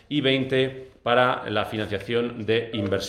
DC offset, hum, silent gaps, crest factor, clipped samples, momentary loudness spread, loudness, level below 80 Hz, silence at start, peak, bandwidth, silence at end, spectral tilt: under 0.1%; none; none; 20 dB; under 0.1%; 7 LU; -24 LUFS; -56 dBFS; 0.1 s; -4 dBFS; 14 kHz; 0 s; -5.5 dB/octave